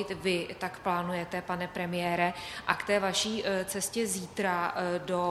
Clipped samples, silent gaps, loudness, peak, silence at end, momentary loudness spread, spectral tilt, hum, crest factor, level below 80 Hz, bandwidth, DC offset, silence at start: under 0.1%; none; -31 LUFS; -8 dBFS; 0 s; 6 LU; -3.5 dB/octave; none; 24 dB; -62 dBFS; 14 kHz; under 0.1%; 0 s